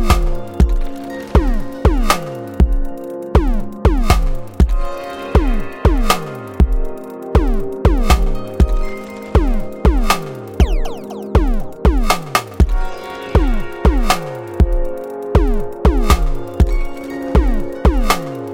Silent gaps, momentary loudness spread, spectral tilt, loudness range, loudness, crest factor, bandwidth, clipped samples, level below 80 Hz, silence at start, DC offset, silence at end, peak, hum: none; 11 LU; -6 dB/octave; 1 LU; -18 LUFS; 14 dB; 16.5 kHz; under 0.1%; -16 dBFS; 0 s; under 0.1%; 0 s; 0 dBFS; none